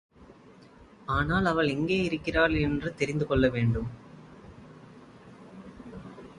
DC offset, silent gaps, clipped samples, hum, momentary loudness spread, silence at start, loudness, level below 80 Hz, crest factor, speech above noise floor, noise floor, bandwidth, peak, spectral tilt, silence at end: under 0.1%; none; under 0.1%; none; 24 LU; 0.2 s; -27 LUFS; -44 dBFS; 20 dB; 27 dB; -53 dBFS; 11 kHz; -10 dBFS; -7 dB/octave; 0 s